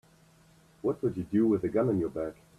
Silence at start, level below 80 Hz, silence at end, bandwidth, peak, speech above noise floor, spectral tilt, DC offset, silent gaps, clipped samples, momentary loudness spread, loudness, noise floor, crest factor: 0.85 s; -60 dBFS; 0.25 s; 12 kHz; -16 dBFS; 32 dB; -9.5 dB/octave; under 0.1%; none; under 0.1%; 8 LU; -30 LUFS; -60 dBFS; 14 dB